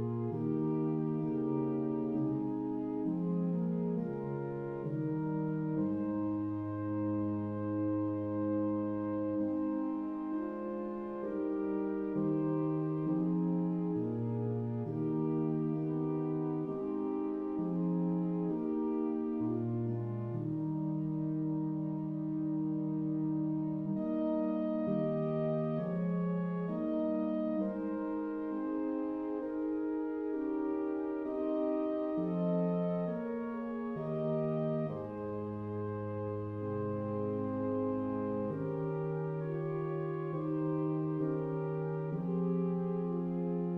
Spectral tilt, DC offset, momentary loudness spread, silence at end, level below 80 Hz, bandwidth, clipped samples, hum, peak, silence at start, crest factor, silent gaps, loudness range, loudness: -12 dB/octave; under 0.1%; 4 LU; 0 s; -68 dBFS; 3.8 kHz; under 0.1%; none; -22 dBFS; 0 s; 12 dB; none; 2 LU; -35 LUFS